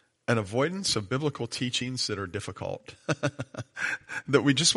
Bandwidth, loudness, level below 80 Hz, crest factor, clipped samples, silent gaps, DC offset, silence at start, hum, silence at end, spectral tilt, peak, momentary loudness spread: 11.5 kHz; -29 LUFS; -62 dBFS; 22 dB; under 0.1%; none; under 0.1%; 0.3 s; none; 0 s; -3.5 dB/octave; -8 dBFS; 11 LU